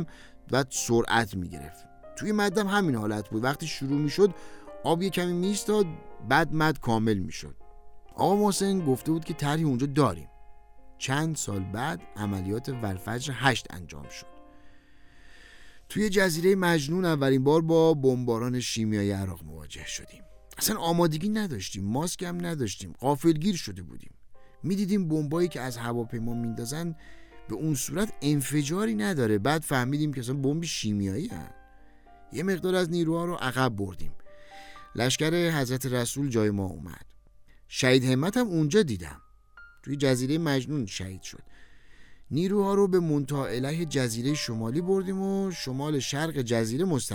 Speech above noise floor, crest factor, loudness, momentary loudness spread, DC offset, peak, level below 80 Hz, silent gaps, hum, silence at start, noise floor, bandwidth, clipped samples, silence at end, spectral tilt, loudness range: 26 dB; 20 dB; -27 LUFS; 15 LU; under 0.1%; -8 dBFS; -52 dBFS; none; none; 0 s; -53 dBFS; over 20 kHz; under 0.1%; 0 s; -5 dB/octave; 5 LU